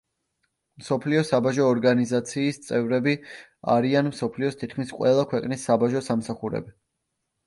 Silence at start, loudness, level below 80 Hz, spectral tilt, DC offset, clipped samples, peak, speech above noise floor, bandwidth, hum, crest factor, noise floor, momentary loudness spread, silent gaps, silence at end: 0.8 s; -24 LUFS; -64 dBFS; -6 dB/octave; under 0.1%; under 0.1%; -8 dBFS; 56 dB; 11.5 kHz; none; 16 dB; -79 dBFS; 10 LU; none; 0.75 s